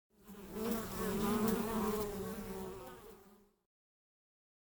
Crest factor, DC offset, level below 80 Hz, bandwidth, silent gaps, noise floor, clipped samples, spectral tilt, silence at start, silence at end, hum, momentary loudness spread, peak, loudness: 18 dB; under 0.1%; -56 dBFS; over 20 kHz; none; -64 dBFS; under 0.1%; -5.5 dB/octave; 0.25 s; 1.35 s; none; 19 LU; -22 dBFS; -38 LUFS